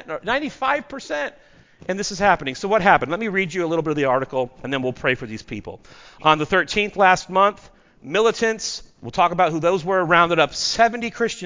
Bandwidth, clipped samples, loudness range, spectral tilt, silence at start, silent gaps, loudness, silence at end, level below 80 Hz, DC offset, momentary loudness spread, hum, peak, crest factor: 7.6 kHz; under 0.1%; 3 LU; -4 dB/octave; 0.05 s; none; -20 LUFS; 0 s; -50 dBFS; under 0.1%; 12 LU; none; -2 dBFS; 20 dB